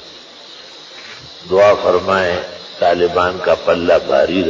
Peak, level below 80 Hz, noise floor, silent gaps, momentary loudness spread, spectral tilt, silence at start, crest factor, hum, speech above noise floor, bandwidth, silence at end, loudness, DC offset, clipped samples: -2 dBFS; -44 dBFS; -37 dBFS; none; 22 LU; -5 dB/octave; 0 s; 14 dB; none; 23 dB; 7.6 kHz; 0 s; -14 LUFS; under 0.1%; under 0.1%